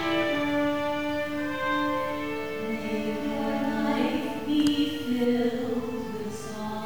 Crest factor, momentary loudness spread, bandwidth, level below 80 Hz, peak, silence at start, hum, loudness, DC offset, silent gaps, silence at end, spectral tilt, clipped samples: 16 dB; 8 LU; over 20 kHz; -58 dBFS; -12 dBFS; 0 s; none; -28 LUFS; 0.7%; none; 0 s; -5 dB/octave; under 0.1%